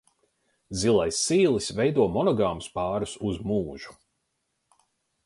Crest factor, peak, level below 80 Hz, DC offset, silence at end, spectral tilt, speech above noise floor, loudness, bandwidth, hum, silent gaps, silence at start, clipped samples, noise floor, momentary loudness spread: 18 dB; -10 dBFS; -52 dBFS; under 0.1%; 1.35 s; -5 dB/octave; 52 dB; -25 LUFS; 11.5 kHz; none; none; 0.7 s; under 0.1%; -77 dBFS; 12 LU